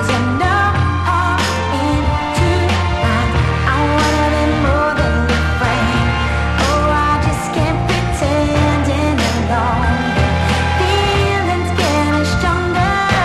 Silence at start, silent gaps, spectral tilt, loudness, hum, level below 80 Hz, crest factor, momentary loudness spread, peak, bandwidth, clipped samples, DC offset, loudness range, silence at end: 0 s; none; -5.5 dB/octave; -15 LUFS; none; -24 dBFS; 14 dB; 3 LU; 0 dBFS; 13 kHz; under 0.1%; under 0.1%; 1 LU; 0 s